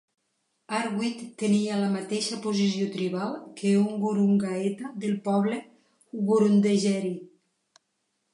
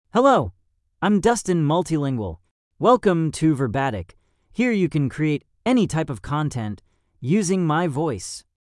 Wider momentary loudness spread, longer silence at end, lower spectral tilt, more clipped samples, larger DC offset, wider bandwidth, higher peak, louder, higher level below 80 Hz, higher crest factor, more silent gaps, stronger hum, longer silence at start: second, 10 LU vs 15 LU; first, 1.05 s vs 0.35 s; about the same, -6 dB/octave vs -6 dB/octave; neither; neither; about the same, 11 kHz vs 12 kHz; second, -10 dBFS vs -4 dBFS; second, -26 LUFS vs -21 LUFS; second, -76 dBFS vs -50 dBFS; about the same, 16 dB vs 18 dB; second, none vs 2.51-2.71 s; neither; first, 0.7 s vs 0.15 s